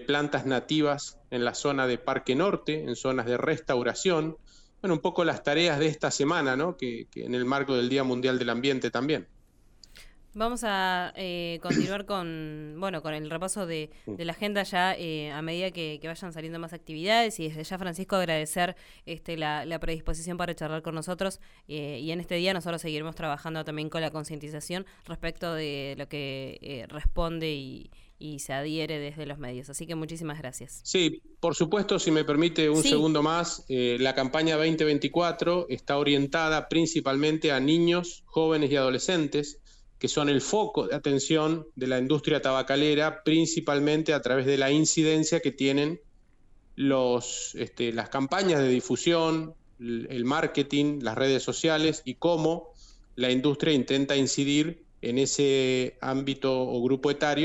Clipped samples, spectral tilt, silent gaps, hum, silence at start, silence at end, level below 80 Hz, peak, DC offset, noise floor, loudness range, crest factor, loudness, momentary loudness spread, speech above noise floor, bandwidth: under 0.1%; -4.5 dB/octave; none; none; 0 s; 0 s; -48 dBFS; -8 dBFS; under 0.1%; -57 dBFS; 9 LU; 18 dB; -28 LUFS; 12 LU; 30 dB; 16 kHz